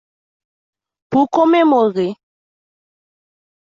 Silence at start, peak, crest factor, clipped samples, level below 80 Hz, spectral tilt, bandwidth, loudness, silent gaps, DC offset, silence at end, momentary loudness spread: 1.1 s; -2 dBFS; 16 dB; under 0.1%; -64 dBFS; -7 dB/octave; 7.4 kHz; -15 LUFS; none; under 0.1%; 1.65 s; 9 LU